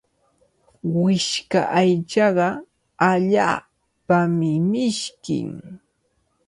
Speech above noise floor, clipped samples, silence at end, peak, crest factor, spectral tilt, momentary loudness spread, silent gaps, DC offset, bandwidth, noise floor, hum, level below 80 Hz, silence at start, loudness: 49 dB; under 0.1%; 0.7 s; -4 dBFS; 18 dB; -5.5 dB/octave; 10 LU; none; under 0.1%; 11.5 kHz; -68 dBFS; none; -62 dBFS; 0.85 s; -20 LUFS